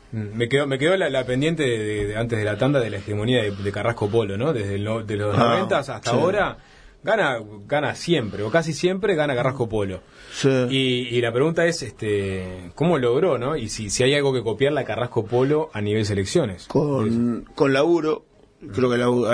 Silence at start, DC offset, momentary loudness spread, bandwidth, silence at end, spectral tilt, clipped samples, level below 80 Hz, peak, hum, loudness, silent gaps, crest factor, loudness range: 0.1 s; under 0.1%; 7 LU; 10.5 kHz; 0 s; -5.5 dB/octave; under 0.1%; -50 dBFS; -2 dBFS; none; -22 LUFS; none; 18 dB; 1 LU